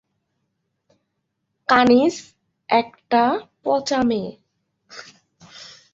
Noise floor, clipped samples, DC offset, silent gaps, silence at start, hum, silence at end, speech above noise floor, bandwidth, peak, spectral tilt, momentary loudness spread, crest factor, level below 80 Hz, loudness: -75 dBFS; under 0.1%; under 0.1%; none; 1.7 s; none; 0.25 s; 57 dB; 7.8 kHz; -2 dBFS; -4.5 dB/octave; 25 LU; 22 dB; -60 dBFS; -19 LUFS